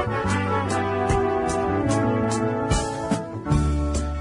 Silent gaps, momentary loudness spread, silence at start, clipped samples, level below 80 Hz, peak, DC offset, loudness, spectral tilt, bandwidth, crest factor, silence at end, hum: none; 4 LU; 0 s; under 0.1%; -32 dBFS; -8 dBFS; under 0.1%; -23 LUFS; -6 dB/octave; 11 kHz; 16 dB; 0 s; none